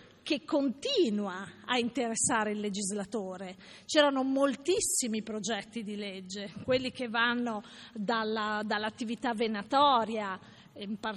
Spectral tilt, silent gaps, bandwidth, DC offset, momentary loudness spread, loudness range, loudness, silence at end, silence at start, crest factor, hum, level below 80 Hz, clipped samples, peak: -3 dB/octave; none; 12 kHz; under 0.1%; 14 LU; 3 LU; -31 LUFS; 0 s; 0 s; 18 dB; none; -68 dBFS; under 0.1%; -12 dBFS